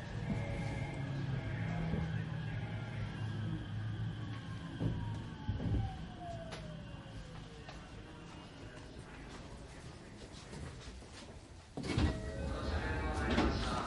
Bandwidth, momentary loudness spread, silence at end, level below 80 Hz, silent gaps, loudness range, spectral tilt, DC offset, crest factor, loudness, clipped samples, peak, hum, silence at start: 11.5 kHz; 15 LU; 0 s; -46 dBFS; none; 10 LU; -6.5 dB/octave; under 0.1%; 22 dB; -41 LUFS; under 0.1%; -18 dBFS; none; 0 s